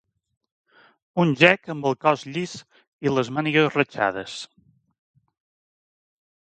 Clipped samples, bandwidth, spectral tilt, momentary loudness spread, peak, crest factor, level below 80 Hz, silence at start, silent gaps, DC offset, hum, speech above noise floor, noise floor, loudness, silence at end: under 0.1%; 9.2 kHz; -5.5 dB/octave; 17 LU; 0 dBFS; 26 dB; -66 dBFS; 1.15 s; 2.87-2.99 s; under 0.1%; none; over 68 dB; under -90 dBFS; -22 LUFS; 2.05 s